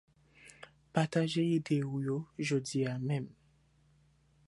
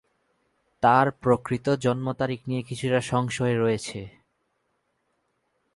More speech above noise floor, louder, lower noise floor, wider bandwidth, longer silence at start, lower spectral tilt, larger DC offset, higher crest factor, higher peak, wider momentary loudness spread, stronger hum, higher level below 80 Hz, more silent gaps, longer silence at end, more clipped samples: second, 35 dB vs 50 dB; second, -34 LUFS vs -25 LUFS; second, -68 dBFS vs -74 dBFS; about the same, 11.5 kHz vs 11.5 kHz; second, 0.45 s vs 0.8 s; about the same, -6 dB/octave vs -6 dB/octave; neither; about the same, 22 dB vs 20 dB; second, -14 dBFS vs -6 dBFS; first, 18 LU vs 10 LU; neither; second, -72 dBFS vs -58 dBFS; neither; second, 1.2 s vs 1.65 s; neither